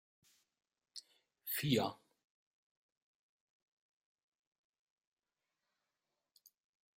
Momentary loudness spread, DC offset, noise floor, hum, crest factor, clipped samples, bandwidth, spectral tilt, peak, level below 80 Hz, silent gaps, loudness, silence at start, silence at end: 20 LU; under 0.1%; under -90 dBFS; none; 28 dB; under 0.1%; 16 kHz; -5 dB/octave; -20 dBFS; -84 dBFS; none; -37 LUFS; 0.95 s; 5 s